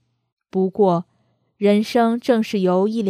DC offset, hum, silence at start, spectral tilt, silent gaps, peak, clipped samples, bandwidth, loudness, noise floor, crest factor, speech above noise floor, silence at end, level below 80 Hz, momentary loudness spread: under 0.1%; none; 0.55 s; -7 dB/octave; none; -4 dBFS; under 0.1%; 14.5 kHz; -19 LUFS; -65 dBFS; 16 dB; 47 dB; 0 s; -68 dBFS; 6 LU